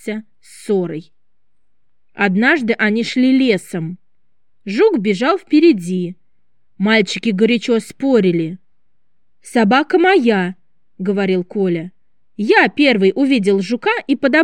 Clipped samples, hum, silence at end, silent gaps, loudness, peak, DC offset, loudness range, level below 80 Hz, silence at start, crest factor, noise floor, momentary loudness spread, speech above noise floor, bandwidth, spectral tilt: under 0.1%; none; 0 s; none; -15 LUFS; -2 dBFS; 0.4%; 2 LU; -72 dBFS; 0.05 s; 14 dB; -75 dBFS; 13 LU; 60 dB; 12.5 kHz; -6 dB/octave